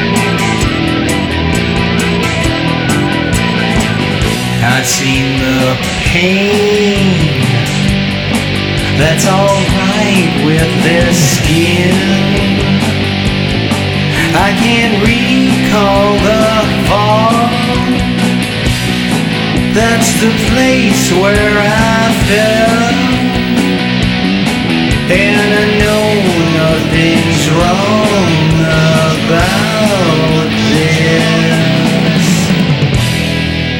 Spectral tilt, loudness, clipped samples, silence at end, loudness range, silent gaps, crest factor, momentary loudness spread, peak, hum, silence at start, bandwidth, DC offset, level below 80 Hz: -5 dB/octave; -10 LUFS; under 0.1%; 0 s; 2 LU; none; 10 dB; 3 LU; 0 dBFS; none; 0 s; 18 kHz; under 0.1%; -26 dBFS